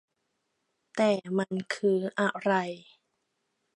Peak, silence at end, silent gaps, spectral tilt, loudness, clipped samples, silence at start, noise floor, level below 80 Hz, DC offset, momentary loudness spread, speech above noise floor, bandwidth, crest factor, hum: -12 dBFS; 0.95 s; none; -6 dB/octave; -29 LUFS; under 0.1%; 0.95 s; -79 dBFS; -80 dBFS; under 0.1%; 11 LU; 51 dB; 11.5 kHz; 20 dB; none